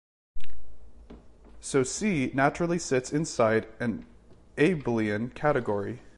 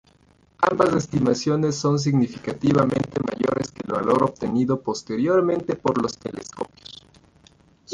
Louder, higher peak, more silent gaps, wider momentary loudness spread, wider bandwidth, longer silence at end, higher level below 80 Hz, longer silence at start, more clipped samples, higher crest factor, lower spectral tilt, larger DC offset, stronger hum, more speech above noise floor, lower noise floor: second, -27 LUFS vs -22 LUFS; second, -10 dBFS vs -4 dBFS; neither; second, 8 LU vs 13 LU; about the same, 11.5 kHz vs 11 kHz; about the same, 0 s vs 0 s; about the same, -52 dBFS vs -54 dBFS; second, 0.35 s vs 0.6 s; neither; about the same, 18 dB vs 18 dB; about the same, -5.5 dB/octave vs -6.5 dB/octave; neither; neither; second, 22 dB vs 36 dB; second, -49 dBFS vs -58 dBFS